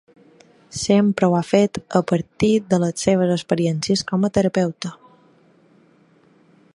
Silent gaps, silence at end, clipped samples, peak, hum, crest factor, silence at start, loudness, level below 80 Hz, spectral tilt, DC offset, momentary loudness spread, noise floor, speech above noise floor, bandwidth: none; 1.8 s; under 0.1%; -2 dBFS; none; 20 dB; 0.75 s; -19 LUFS; -54 dBFS; -6 dB/octave; under 0.1%; 7 LU; -55 dBFS; 36 dB; 11.5 kHz